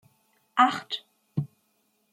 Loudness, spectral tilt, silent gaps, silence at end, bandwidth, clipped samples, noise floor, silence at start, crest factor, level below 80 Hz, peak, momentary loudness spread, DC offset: -27 LUFS; -5 dB/octave; none; 0.65 s; 14.5 kHz; under 0.1%; -71 dBFS; 0.55 s; 24 dB; -76 dBFS; -6 dBFS; 13 LU; under 0.1%